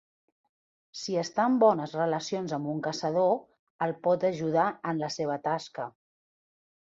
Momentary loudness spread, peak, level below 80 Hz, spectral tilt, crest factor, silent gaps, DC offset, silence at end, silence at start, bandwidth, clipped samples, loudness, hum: 10 LU; -10 dBFS; -76 dBFS; -5.5 dB/octave; 20 dB; 3.59-3.79 s; under 0.1%; 0.95 s; 0.95 s; 7.8 kHz; under 0.1%; -29 LUFS; none